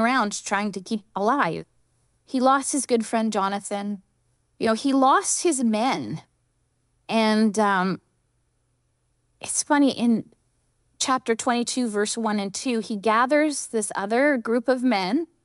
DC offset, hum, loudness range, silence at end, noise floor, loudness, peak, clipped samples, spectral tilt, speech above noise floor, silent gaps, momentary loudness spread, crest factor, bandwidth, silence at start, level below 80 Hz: under 0.1%; none; 3 LU; 0.2 s; -70 dBFS; -23 LUFS; -6 dBFS; under 0.1%; -3.5 dB/octave; 47 dB; none; 9 LU; 18 dB; 12 kHz; 0 s; -70 dBFS